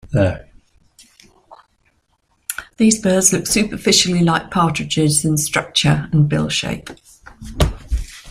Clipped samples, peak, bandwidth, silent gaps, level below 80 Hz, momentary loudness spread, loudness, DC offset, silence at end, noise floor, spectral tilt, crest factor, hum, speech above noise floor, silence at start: under 0.1%; 0 dBFS; 16 kHz; none; -32 dBFS; 15 LU; -16 LUFS; under 0.1%; 0 s; -64 dBFS; -4 dB/octave; 18 dB; none; 47 dB; 0.05 s